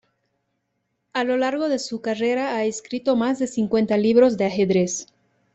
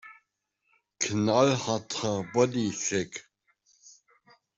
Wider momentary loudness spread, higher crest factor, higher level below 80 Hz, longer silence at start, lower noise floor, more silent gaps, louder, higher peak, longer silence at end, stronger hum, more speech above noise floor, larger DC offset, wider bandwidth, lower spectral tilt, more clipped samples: about the same, 9 LU vs 9 LU; about the same, 16 dB vs 20 dB; first, -62 dBFS vs -68 dBFS; first, 1.15 s vs 0.05 s; about the same, -75 dBFS vs -78 dBFS; neither; first, -22 LUFS vs -27 LUFS; first, -6 dBFS vs -10 dBFS; second, 0.5 s vs 1.35 s; neither; about the same, 54 dB vs 51 dB; neither; about the same, 8.4 kHz vs 8.2 kHz; about the same, -5 dB/octave vs -4.5 dB/octave; neither